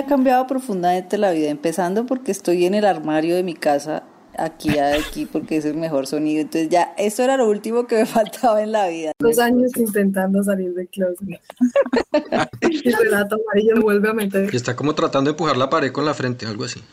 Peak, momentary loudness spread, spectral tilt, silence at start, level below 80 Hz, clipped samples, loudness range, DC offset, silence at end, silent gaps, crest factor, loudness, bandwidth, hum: -6 dBFS; 7 LU; -5.5 dB/octave; 0 s; -50 dBFS; under 0.1%; 3 LU; under 0.1%; 0.1 s; none; 12 dB; -19 LUFS; 16 kHz; none